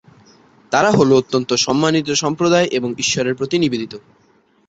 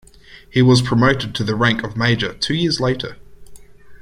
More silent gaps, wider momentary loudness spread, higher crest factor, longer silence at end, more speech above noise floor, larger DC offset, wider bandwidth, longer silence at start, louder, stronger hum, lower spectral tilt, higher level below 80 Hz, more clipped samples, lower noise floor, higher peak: neither; about the same, 7 LU vs 8 LU; about the same, 16 dB vs 18 dB; first, 0.7 s vs 0 s; first, 33 dB vs 21 dB; neither; second, 8 kHz vs 11 kHz; first, 0.7 s vs 0.3 s; about the same, -16 LUFS vs -17 LUFS; neither; second, -4 dB/octave vs -5.5 dB/octave; second, -54 dBFS vs -42 dBFS; neither; first, -49 dBFS vs -38 dBFS; about the same, -2 dBFS vs -2 dBFS